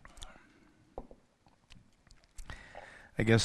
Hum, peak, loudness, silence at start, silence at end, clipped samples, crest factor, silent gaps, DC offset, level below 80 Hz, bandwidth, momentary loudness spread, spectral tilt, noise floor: none; -10 dBFS; -39 LUFS; 0.15 s; 0 s; under 0.1%; 26 dB; none; under 0.1%; -54 dBFS; 12 kHz; 25 LU; -5 dB/octave; -67 dBFS